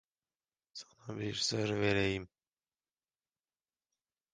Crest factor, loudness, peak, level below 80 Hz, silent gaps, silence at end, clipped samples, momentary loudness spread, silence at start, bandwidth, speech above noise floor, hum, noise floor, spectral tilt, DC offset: 22 dB; -34 LUFS; -18 dBFS; -62 dBFS; none; 2.05 s; under 0.1%; 19 LU; 0.75 s; 10 kHz; over 56 dB; none; under -90 dBFS; -4.5 dB/octave; under 0.1%